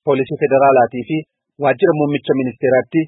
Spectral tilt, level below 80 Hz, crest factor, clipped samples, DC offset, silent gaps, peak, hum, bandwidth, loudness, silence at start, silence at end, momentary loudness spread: -12.5 dB/octave; -62 dBFS; 14 dB; under 0.1%; under 0.1%; none; -2 dBFS; none; 4 kHz; -16 LUFS; 0.05 s; 0 s; 9 LU